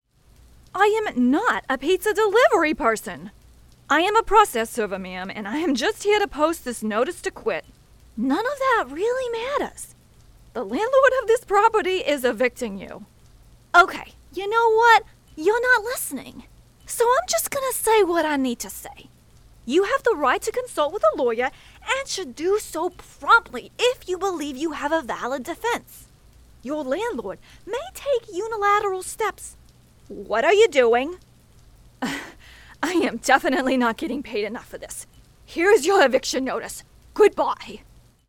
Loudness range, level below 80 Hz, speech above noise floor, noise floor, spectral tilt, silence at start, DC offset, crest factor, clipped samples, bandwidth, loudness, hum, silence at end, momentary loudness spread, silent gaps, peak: 6 LU; -52 dBFS; 31 dB; -53 dBFS; -3 dB/octave; 0.75 s; under 0.1%; 20 dB; under 0.1%; 18.5 kHz; -22 LUFS; none; 0.5 s; 18 LU; none; -2 dBFS